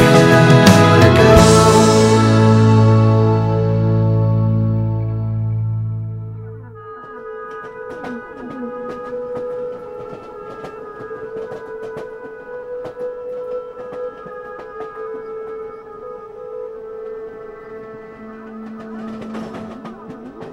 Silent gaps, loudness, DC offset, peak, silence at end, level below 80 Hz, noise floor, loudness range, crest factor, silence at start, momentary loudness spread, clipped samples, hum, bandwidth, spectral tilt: none; -13 LUFS; under 0.1%; 0 dBFS; 0 s; -38 dBFS; -35 dBFS; 20 LU; 16 dB; 0 s; 24 LU; under 0.1%; none; 14.5 kHz; -6 dB/octave